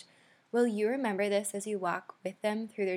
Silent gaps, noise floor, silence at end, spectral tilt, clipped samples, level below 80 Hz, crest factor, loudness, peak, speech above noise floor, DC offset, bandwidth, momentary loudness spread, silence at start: none; -64 dBFS; 0 s; -4.5 dB/octave; under 0.1%; under -90 dBFS; 16 dB; -32 LUFS; -18 dBFS; 32 dB; under 0.1%; 16.5 kHz; 6 LU; 0.55 s